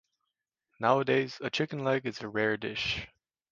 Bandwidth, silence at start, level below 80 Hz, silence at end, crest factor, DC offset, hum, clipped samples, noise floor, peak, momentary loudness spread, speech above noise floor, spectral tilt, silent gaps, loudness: 7.4 kHz; 0.8 s; -62 dBFS; 0.45 s; 22 dB; under 0.1%; none; under 0.1%; -85 dBFS; -10 dBFS; 7 LU; 55 dB; -5.5 dB/octave; none; -30 LUFS